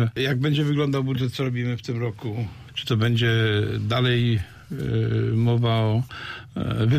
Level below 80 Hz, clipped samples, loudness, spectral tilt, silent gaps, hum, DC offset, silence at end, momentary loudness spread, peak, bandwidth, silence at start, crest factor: -48 dBFS; under 0.1%; -24 LUFS; -7 dB/octave; none; none; under 0.1%; 0 s; 11 LU; -12 dBFS; 14 kHz; 0 s; 12 dB